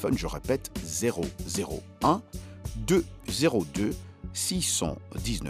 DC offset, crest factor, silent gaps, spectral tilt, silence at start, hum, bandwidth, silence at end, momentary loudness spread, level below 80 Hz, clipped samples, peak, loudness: under 0.1%; 20 dB; none; -4 dB/octave; 0 s; none; 15.5 kHz; 0 s; 10 LU; -42 dBFS; under 0.1%; -8 dBFS; -29 LUFS